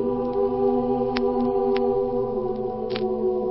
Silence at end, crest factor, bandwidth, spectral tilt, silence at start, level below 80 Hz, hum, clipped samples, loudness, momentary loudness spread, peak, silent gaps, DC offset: 0 s; 18 dB; 5.8 kHz; -11 dB/octave; 0 s; -48 dBFS; 50 Hz at -50 dBFS; under 0.1%; -24 LUFS; 5 LU; -4 dBFS; none; under 0.1%